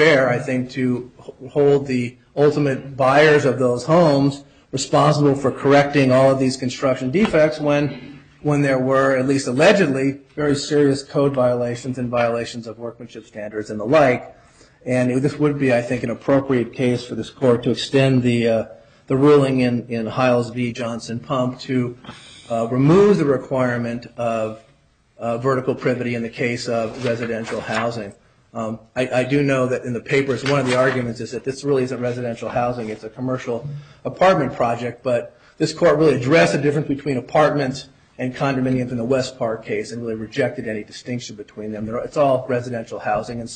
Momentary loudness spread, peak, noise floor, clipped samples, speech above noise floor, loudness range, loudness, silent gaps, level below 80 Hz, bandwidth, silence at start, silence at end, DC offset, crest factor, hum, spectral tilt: 14 LU; -2 dBFS; -56 dBFS; under 0.1%; 38 dB; 6 LU; -19 LUFS; none; -52 dBFS; 9.4 kHz; 0 s; 0 s; under 0.1%; 18 dB; none; -6 dB/octave